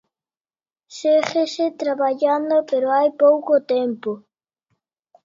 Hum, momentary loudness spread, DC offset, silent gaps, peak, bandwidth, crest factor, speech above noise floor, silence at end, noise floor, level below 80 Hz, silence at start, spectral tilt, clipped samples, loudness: none; 11 LU; under 0.1%; none; -4 dBFS; 7.6 kHz; 16 dB; over 71 dB; 1.05 s; under -90 dBFS; -76 dBFS; 0.9 s; -4.5 dB/octave; under 0.1%; -19 LUFS